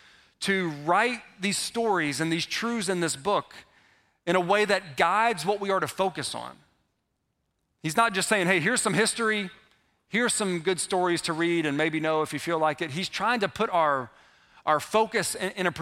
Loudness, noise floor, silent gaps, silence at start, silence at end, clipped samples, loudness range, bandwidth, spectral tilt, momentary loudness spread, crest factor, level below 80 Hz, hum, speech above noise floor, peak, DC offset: -26 LUFS; -77 dBFS; none; 0.4 s; 0 s; under 0.1%; 2 LU; 16 kHz; -3.5 dB/octave; 8 LU; 22 dB; -66 dBFS; none; 51 dB; -6 dBFS; under 0.1%